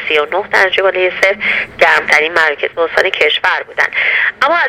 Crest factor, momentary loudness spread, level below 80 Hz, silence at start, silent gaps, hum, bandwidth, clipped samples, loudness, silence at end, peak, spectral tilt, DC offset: 12 dB; 5 LU; -52 dBFS; 0 s; none; none; 19 kHz; 0.2%; -11 LUFS; 0 s; 0 dBFS; -2 dB/octave; under 0.1%